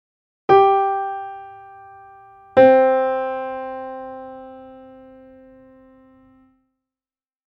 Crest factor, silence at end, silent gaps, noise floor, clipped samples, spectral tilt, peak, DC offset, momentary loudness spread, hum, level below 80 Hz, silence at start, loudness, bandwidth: 20 dB; 2.75 s; none; under -90 dBFS; under 0.1%; -7.5 dB/octave; 0 dBFS; under 0.1%; 25 LU; none; -62 dBFS; 0.5 s; -17 LUFS; 5.6 kHz